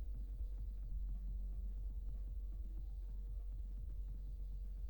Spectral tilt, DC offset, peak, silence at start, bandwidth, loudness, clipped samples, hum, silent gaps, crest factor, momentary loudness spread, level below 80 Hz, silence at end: -9 dB/octave; under 0.1%; -34 dBFS; 0 s; 19.5 kHz; -49 LUFS; under 0.1%; none; none; 10 dB; 2 LU; -44 dBFS; 0 s